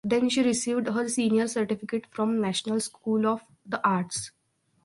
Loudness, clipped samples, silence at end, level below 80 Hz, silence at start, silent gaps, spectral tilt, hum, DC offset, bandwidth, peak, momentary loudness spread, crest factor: -27 LUFS; under 0.1%; 0.55 s; -68 dBFS; 0.05 s; none; -4.5 dB/octave; none; under 0.1%; 11.5 kHz; -8 dBFS; 9 LU; 18 dB